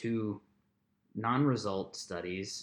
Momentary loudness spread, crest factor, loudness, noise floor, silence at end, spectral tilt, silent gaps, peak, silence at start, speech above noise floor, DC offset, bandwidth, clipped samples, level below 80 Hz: 12 LU; 18 dB; -34 LUFS; -76 dBFS; 0 s; -5.5 dB/octave; none; -18 dBFS; 0 s; 42 dB; under 0.1%; 12.5 kHz; under 0.1%; -72 dBFS